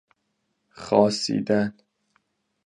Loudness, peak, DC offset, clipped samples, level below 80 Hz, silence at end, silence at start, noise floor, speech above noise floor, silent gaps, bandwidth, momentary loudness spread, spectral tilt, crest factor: -23 LUFS; -4 dBFS; under 0.1%; under 0.1%; -64 dBFS; 0.95 s; 0.8 s; -75 dBFS; 53 dB; none; 11 kHz; 10 LU; -5 dB/octave; 22 dB